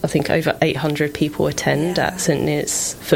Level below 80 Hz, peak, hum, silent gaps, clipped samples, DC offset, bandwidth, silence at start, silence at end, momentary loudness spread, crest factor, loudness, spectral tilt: -46 dBFS; -4 dBFS; none; none; under 0.1%; under 0.1%; 17 kHz; 0 s; 0 s; 2 LU; 16 dB; -19 LUFS; -4.5 dB/octave